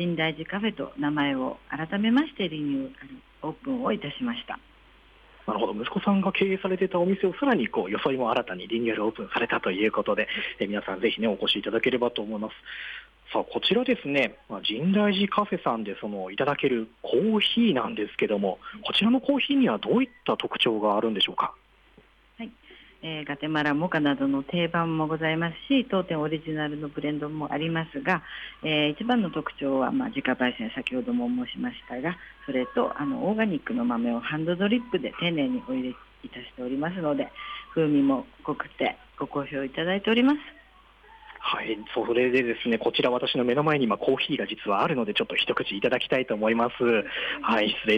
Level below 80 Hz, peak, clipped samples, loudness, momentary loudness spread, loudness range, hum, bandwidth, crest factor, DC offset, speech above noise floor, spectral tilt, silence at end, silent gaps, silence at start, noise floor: -60 dBFS; -12 dBFS; under 0.1%; -26 LUFS; 10 LU; 4 LU; none; 9.6 kHz; 16 dB; under 0.1%; 31 dB; -7 dB/octave; 0 s; none; 0 s; -57 dBFS